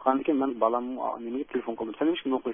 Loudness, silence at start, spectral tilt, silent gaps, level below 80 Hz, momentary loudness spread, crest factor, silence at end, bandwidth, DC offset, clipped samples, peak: -29 LUFS; 0 s; -9 dB/octave; none; -68 dBFS; 7 LU; 18 dB; 0 s; 3.7 kHz; under 0.1%; under 0.1%; -10 dBFS